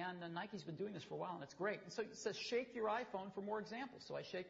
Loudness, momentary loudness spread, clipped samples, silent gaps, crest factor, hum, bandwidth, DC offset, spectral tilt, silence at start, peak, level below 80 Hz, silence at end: -46 LUFS; 7 LU; under 0.1%; none; 16 dB; none; 7.6 kHz; under 0.1%; -3.5 dB/octave; 0 s; -28 dBFS; -82 dBFS; 0 s